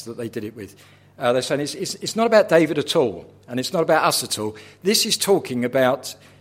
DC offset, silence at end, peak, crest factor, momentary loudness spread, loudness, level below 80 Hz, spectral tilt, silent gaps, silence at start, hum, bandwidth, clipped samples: under 0.1%; 0.25 s; -2 dBFS; 20 dB; 14 LU; -20 LUFS; -66 dBFS; -3.5 dB/octave; none; 0 s; none; 16.5 kHz; under 0.1%